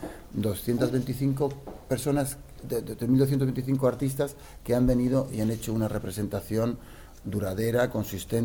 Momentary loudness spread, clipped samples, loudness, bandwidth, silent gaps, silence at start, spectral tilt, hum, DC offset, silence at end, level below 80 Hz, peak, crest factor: 9 LU; under 0.1%; -28 LUFS; 19 kHz; none; 0 s; -7 dB/octave; none; under 0.1%; 0 s; -44 dBFS; -12 dBFS; 16 dB